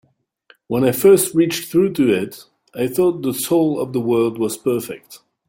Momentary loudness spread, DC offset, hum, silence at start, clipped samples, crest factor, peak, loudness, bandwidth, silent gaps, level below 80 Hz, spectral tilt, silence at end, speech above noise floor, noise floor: 12 LU; under 0.1%; none; 0.7 s; under 0.1%; 16 dB; -2 dBFS; -18 LUFS; 17 kHz; none; -58 dBFS; -5 dB/octave; 0.3 s; 37 dB; -55 dBFS